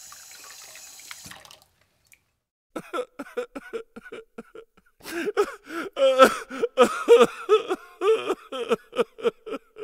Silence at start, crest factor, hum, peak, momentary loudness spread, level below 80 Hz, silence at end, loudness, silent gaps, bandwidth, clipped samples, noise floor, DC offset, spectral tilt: 0.05 s; 24 dB; none; 0 dBFS; 25 LU; -66 dBFS; 0 s; -23 LUFS; 2.51-2.70 s; 16 kHz; under 0.1%; -64 dBFS; under 0.1%; -3 dB/octave